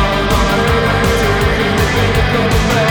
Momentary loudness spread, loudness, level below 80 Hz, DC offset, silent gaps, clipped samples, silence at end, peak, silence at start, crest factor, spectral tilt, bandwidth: 1 LU; -13 LUFS; -20 dBFS; under 0.1%; none; under 0.1%; 0 s; -2 dBFS; 0 s; 12 dB; -5 dB/octave; over 20 kHz